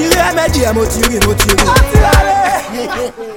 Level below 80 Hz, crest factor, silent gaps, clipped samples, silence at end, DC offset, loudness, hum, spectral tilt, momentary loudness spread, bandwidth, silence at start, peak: -18 dBFS; 10 dB; none; 0.1%; 0 s; under 0.1%; -11 LUFS; none; -4 dB/octave; 9 LU; 18 kHz; 0 s; 0 dBFS